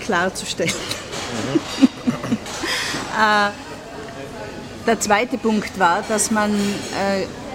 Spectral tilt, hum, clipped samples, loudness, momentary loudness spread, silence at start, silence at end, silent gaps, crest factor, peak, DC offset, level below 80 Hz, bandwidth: -3.5 dB/octave; none; under 0.1%; -20 LUFS; 15 LU; 0 s; 0 s; none; 20 dB; 0 dBFS; under 0.1%; -48 dBFS; 16.5 kHz